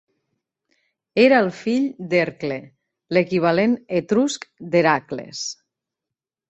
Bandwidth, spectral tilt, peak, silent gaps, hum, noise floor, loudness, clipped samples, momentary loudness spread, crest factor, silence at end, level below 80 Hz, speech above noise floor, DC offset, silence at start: 8.4 kHz; -5 dB/octave; -2 dBFS; none; none; -86 dBFS; -20 LUFS; under 0.1%; 14 LU; 18 dB; 0.95 s; -64 dBFS; 67 dB; under 0.1%; 1.15 s